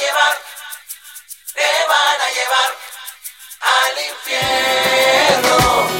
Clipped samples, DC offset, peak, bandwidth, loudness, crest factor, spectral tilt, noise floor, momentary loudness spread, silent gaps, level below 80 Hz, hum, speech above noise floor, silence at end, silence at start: under 0.1%; under 0.1%; 0 dBFS; 17 kHz; -14 LUFS; 16 dB; -1.5 dB/octave; -37 dBFS; 19 LU; none; -44 dBFS; none; 22 dB; 0 s; 0 s